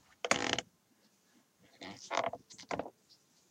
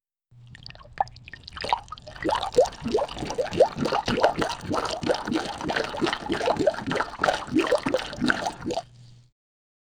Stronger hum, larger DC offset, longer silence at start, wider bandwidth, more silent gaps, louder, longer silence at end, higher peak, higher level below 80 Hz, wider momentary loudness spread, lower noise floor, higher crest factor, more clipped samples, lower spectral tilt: neither; neither; about the same, 0.25 s vs 0.35 s; about the same, 16.5 kHz vs 17.5 kHz; neither; second, -37 LUFS vs -26 LUFS; second, 0.6 s vs 0.85 s; second, -10 dBFS vs -2 dBFS; second, -72 dBFS vs -50 dBFS; first, 18 LU vs 10 LU; first, -71 dBFS vs -53 dBFS; first, 30 dB vs 24 dB; neither; second, -2 dB/octave vs -4.5 dB/octave